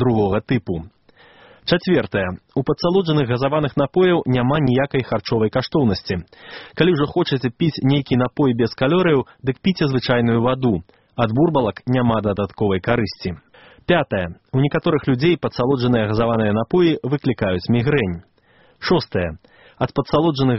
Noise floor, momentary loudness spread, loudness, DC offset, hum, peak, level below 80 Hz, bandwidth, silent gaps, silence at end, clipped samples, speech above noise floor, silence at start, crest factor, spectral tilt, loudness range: -55 dBFS; 9 LU; -19 LUFS; 0.2%; none; -2 dBFS; -46 dBFS; 6 kHz; none; 0 s; under 0.1%; 36 dB; 0 s; 18 dB; -6 dB/octave; 2 LU